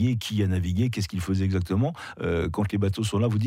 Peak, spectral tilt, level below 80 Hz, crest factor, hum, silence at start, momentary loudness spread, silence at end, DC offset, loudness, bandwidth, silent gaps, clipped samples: -14 dBFS; -6.5 dB/octave; -50 dBFS; 12 dB; none; 0 s; 3 LU; 0 s; under 0.1%; -26 LUFS; 15.5 kHz; none; under 0.1%